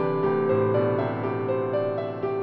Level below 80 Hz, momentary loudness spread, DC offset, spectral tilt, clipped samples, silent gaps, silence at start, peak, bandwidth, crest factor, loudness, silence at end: -60 dBFS; 6 LU; under 0.1%; -11 dB/octave; under 0.1%; none; 0 s; -12 dBFS; 5 kHz; 12 dB; -25 LUFS; 0 s